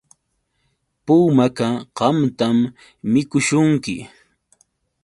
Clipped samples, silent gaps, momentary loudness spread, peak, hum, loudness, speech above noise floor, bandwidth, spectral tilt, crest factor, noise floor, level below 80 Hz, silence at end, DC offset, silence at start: under 0.1%; none; 13 LU; -2 dBFS; none; -18 LUFS; 53 dB; 11.5 kHz; -6 dB/octave; 18 dB; -70 dBFS; -58 dBFS; 1 s; under 0.1%; 1.05 s